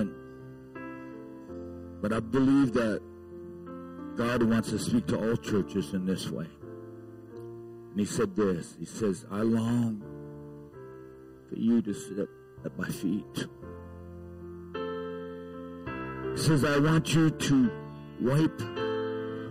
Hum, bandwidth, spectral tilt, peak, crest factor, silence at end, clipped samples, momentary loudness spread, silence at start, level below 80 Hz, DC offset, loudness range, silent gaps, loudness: none; 15.5 kHz; -6 dB/octave; -18 dBFS; 14 dB; 0 s; under 0.1%; 21 LU; 0 s; -56 dBFS; under 0.1%; 9 LU; none; -29 LUFS